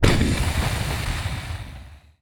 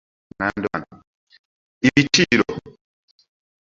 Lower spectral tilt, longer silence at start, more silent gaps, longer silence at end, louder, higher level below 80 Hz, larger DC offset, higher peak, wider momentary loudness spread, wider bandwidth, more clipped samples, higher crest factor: about the same, -5 dB/octave vs -4 dB/octave; second, 0 s vs 0.4 s; second, none vs 1.07-1.27 s, 1.39-1.81 s; second, 0.25 s vs 1 s; second, -25 LUFS vs -19 LUFS; first, -28 dBFS vs -52 dBFS; neither; about the same, 0 dBFS vs 0 dBFS; about the same, 15 LU vs 13 LU; first, 20 kHz vs 7.8 kHz; neither; about the same, 22 dB vs 22 dB